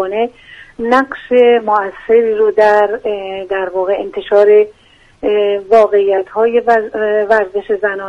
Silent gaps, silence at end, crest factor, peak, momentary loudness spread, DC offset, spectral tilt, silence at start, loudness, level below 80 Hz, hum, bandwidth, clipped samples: none; 0 s; 12 dB; 0 dBFS; 10 LU; under 0.1%; -5.5 dB/octave; 0 s; -13 LUFS; -50 dBFS; none; 7.2 kHz; under 0.1%